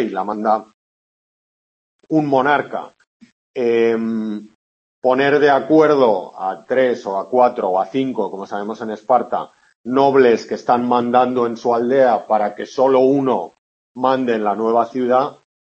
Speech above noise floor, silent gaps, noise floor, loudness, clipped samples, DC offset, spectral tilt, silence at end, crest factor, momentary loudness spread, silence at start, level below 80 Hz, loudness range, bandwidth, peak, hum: over 74 dB; 0.74-1.99 s, 3.07-3.20 s, 3.32-3.54 s, 4.55-5.02 s, 9.75-9.84 s, 13.58-13.95 s; under -90 dBFS; -17 LUFS; under 0.1%; under 0.1%; -6.5 dB/octave; 0.3 s; 16 dB; 12 LU; 0 s; -70 dBFS; 4 LU; 7.8 kHz; -2 dBFS; none